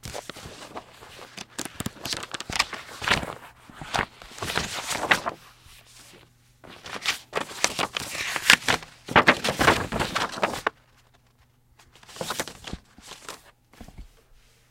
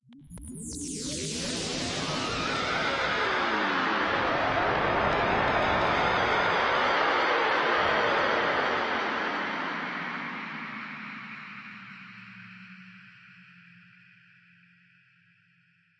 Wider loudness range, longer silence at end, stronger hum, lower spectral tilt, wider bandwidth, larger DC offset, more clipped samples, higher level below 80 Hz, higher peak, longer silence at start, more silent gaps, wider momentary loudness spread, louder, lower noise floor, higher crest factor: about the same, 14 LU vs 16 LU; second, 0.65 s vs 2.5 s; neither; second, -2 dB/octave vs -3.5 dB/octave; first, 17 kHz vs 11.5 kHz; neither; neither; about the same, -50 dBFS vs -52 dBFS; first, 0 dBFS vs -12 dBFS; about the same, 0.05 s vs 0.1 s; neither; first, 23 LU vs 19 LU; about the same, -25 LUFS vs -27 LUFS; second, -61 dBFS vs -66 dBFS; first, 28 dB vs 18 dB